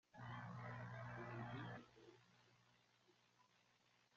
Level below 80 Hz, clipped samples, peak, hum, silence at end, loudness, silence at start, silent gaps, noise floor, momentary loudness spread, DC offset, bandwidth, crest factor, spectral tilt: -80 dBFS; under 0.1%; -40 dBFS; 60 Hz at -65 dBFS; 0.2 s; -54 LUFS; 0.15 s; none; -79 dBFS; 15 LU; under 0.1%; 7.4 kHz; 16 dB; -5.5 dB/octave